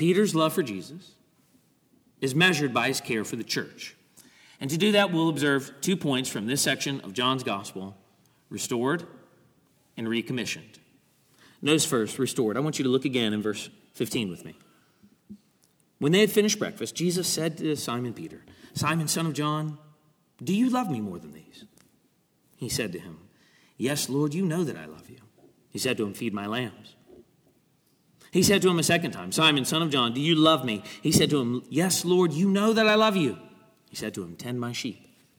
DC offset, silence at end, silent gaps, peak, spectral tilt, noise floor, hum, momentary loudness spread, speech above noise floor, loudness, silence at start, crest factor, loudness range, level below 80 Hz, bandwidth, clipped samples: under 0.1%; 0.45 s; none; -6 dBFS; -4 dB/octave; -67 dBFS; none; 17 LU; 41 dB; -26 LUFS; 0 s; 22 dB; 9 LU; -66 dBFS; 19.5 kHz; under 0.1%